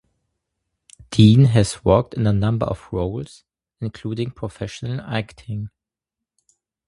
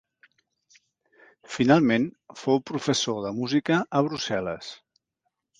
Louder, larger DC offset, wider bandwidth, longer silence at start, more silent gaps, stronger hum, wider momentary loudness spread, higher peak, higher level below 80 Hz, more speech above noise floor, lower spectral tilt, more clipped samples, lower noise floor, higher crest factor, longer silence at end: first, -20 LUFS vs -25 LUFS; neither; first, 11.5 kHz vs 9.6 kHz; second, 1.1 s vs 1.5 s; neither; neither; first, 18 LU vs 14 LU; first, 0 dBFS vs -4 dBFS; first, -42 dBFS vs -64 dBFS; first, 67 dB vs 55 dB; first, -7 dB/octave vs -5 dB/octave; neither; first, -86 dBFS vs -80 dBFS; about the same, 20 dB vs 22 dB; first, 1.2 s vs 0.85 s